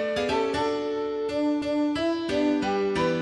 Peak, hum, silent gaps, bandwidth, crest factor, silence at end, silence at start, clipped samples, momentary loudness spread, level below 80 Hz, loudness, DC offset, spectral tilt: -14 dBFS; none; none; 11 kHz; 12 dB; 0 s; 0 s; under 0.1%; 4 LU; -54 dBFS; -26 LUFS; under 0.1%; -5.5 dB/octave